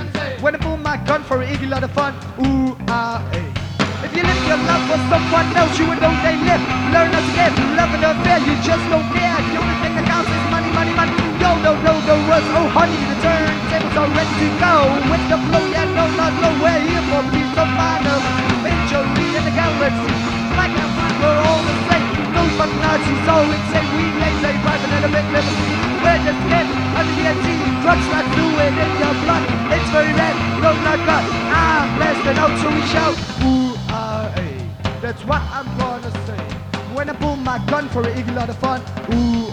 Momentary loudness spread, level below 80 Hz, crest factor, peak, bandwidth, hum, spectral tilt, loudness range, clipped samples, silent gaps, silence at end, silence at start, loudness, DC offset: 7 LU; -32 dBFS; 16 dB; 0 dBFS; 11 kHz; none; -5.5 dB/octave; 5 LU; under 0.1%; none; 0 s; 0 s; -17 LUFS; under 0.1%